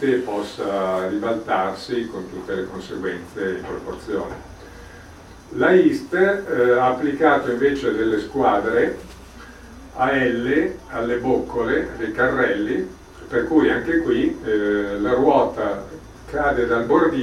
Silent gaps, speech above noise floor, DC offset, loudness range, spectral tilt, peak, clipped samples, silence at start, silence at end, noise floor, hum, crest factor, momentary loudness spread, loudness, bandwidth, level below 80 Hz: none; 22 dB; under 0.1%; 7 LU; -6.5 dB/octave; -2 dBFS; under 0.1%; 0 s; 0 s; -42 dBFS; none; 18 dB; 16 LU; -21 LUFS; 12.5 kHz; -46 dBFS